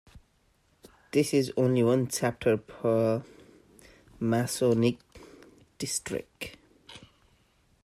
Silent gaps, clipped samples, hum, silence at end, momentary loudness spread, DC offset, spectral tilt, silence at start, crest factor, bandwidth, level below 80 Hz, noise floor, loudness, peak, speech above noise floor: none; under 0.1%; none; 0.85 s; 17 LU; under 0.1%; -5.5 dB/octave; 0.15 s; 18 dB; 15.5 kHz; -62 dBFS; -68 dBFS; -28 LUFS; -12 dBFS; 41 dB